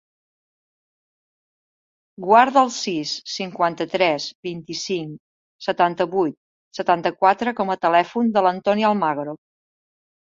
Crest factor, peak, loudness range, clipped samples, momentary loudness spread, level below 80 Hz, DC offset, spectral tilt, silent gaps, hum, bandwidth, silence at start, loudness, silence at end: 20 dB; -2 dBFS; 4 LU; under 0.1%; 12 LU; -68 dBFS; under 0.1%; -4.5 dB/octave; 4.35-4.43 s, 5.20-5.59 s, 6.37-6.71 s; none; 7.8 kHz; 2.2 s; -20 LUFS; 0.9 s